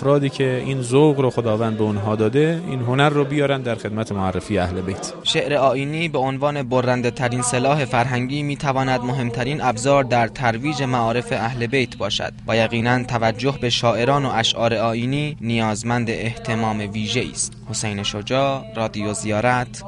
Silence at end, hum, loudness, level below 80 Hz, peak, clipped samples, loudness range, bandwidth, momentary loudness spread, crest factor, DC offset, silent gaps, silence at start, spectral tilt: 0 s; none; -20 LUFS; -46 dBFS; -4 dBFS; under 0.1%; 3 LU; 11.5 kHz; 6 LU; 16 dB; under 0.1%; none; 0 s; -5 dB/octave